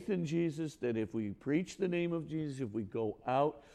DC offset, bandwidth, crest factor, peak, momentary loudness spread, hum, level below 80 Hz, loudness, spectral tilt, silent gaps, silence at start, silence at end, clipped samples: under 0.1%; 10.5 kHz; 16 dB; -20 dBFS; 6 LU; none; -68 dBFS; -36 LUFS; -7 dB/octave; none; 0 s; 0 s; under 0.1%